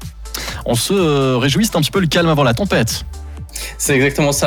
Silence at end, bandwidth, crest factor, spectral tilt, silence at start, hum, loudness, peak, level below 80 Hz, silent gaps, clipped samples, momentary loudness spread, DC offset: 0 s; 20 kHz; 12 dB; -4.5 dB/octave; 0 s; none; -15 LUFS; -4 dBFS; -32 dBFS; none; under 0.1%; 13 LU; under 0.1%